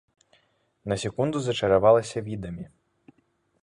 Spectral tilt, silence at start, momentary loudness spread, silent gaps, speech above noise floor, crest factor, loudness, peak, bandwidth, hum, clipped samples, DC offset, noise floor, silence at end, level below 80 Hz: -5.5 dB/octave; 0.85 s; 21 LU; none; 45 dB; 20 dB; -24 LUFS; -6 dBFS; 11.5 kHz; none; under 0.1%; under 0.1%; -69 dBFS; 0.95 s; -54 dBFS